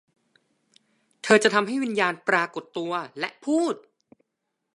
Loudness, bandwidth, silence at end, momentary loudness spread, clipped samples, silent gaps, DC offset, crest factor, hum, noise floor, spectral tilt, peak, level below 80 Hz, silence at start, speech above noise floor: -24 LUFS; 11.5 kHz; 0.95 s; 14 LU; under 0.1%; none; under 0.1%; 22 dB; none; -81 dBFS; -4 dB/octave; -4 dBFS; -80 dBFS; 1.25 s; 57 dB